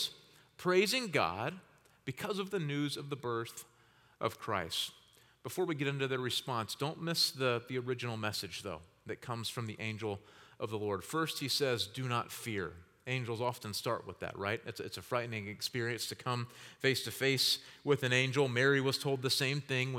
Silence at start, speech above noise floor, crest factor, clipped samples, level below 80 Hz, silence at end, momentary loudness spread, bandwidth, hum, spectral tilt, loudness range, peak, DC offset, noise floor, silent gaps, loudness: 0 s; 24 dB; 22 dB; under 0.1%; -76 dBFS; 0 s; 13 LU; 18 kHz; none; -4 dB/octave; 7 LU; -14 dBFS; under 0.1%; -60 dBFS; none; -35 LUFS